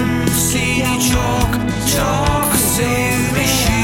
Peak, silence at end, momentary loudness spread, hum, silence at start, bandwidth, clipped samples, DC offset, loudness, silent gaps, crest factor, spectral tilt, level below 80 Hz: -2 dBFS; 0 s; 3 LU; none; 0 s; 17 kHz; under 0.1%; under 0.1%; -15 LUFS; none; 14 dB; -4 dB/octave; -26 dBFS